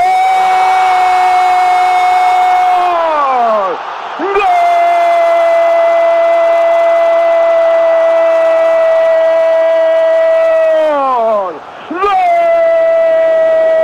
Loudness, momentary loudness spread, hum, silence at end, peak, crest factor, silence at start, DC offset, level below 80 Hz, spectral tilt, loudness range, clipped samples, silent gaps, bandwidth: -10 LUFS; 3 LU; none; 0 s; -2 dBFS; 8 dB; 0 s; under 0.1%; -52 dBFS; -3 dB/octave; 2 LU; under 0.1%; none; 11 kHz